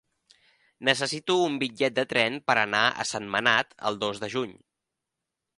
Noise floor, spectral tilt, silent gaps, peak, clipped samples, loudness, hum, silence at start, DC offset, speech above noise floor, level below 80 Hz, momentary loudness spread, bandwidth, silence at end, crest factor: -86 dBFS; -3 dB/octave; none; -4 dBFS; under 0.1%; -25 LUFS; none; 0.8 s; under 0.1%; 59 dB; -68 dBFS; 8 LU; 11.5 kHz; 1.05 s; 24 dB